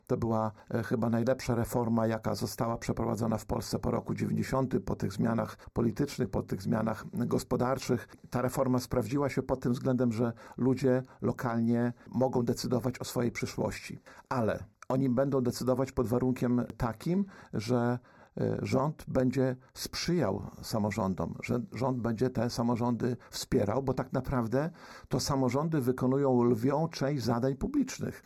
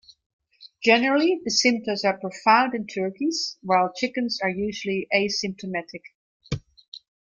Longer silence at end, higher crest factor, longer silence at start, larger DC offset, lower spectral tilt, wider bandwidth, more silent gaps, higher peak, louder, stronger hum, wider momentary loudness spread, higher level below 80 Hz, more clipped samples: second, 0.05 s vs 0.25 s; second, 14 dB vs 22 dB; second, 0.1 s vs 0.6 s; neither; first, -6.5 dB/octave vs -3.5 dB/octave; first, 15 kHz vs 9.2 kHz; second, none vs 6.15-6.40 s, 6.88-6.92 s; second, -16 dBFS vs -4 dBFS; second, -31 LUFS vs -23 LUFS; neither; second, 6 LU vs 15 LU; about the same, -54 dBFS vs -58 dBFS; neither